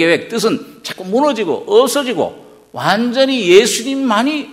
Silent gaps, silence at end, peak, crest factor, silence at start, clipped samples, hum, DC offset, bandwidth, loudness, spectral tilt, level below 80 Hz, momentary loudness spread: none; 0 s; 0 dBFS; 14 dB; 0 s; 0.2%; none; under 0.1%; 16 kHz; -14 LUFS; -3.5 dB/octave; -60 dBFS; 13 LU